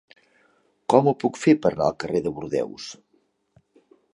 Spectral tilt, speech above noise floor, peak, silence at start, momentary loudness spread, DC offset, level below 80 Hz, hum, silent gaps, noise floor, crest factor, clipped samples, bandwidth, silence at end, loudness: -6.5 dB/octave; 45 dB; -2 dBFS; 0.9 s; 16 LU; under 0.1%; -58 dBFS; none; none; -67 dBFS; 22 dB; under 0.1%; 11 kHz; 1.2 s; -22 LUFS